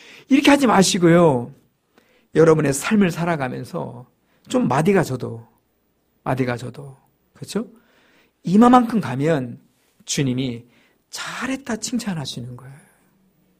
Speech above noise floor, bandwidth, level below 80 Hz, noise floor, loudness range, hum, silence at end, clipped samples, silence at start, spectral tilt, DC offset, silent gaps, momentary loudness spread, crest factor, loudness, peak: 47 dB; 15.5 kHz; -54 dBFS; -66 dBFS; 9 LU; none; 0.85 s; under 0.1%; 0.3 s; -5.5 dB/octave; under 0.1%; none; 20 LU; 20 dB; -19 LUFS; 0 dBFS